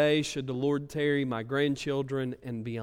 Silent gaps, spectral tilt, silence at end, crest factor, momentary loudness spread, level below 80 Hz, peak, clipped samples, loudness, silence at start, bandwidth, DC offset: none; -5.5 dB/octave; 0 s; 16 dB; 7 LU; -62 dBFS; -14 dBFS; under 0.1%; -30 LUFS; 0 s; 15 kHz; under 0.1%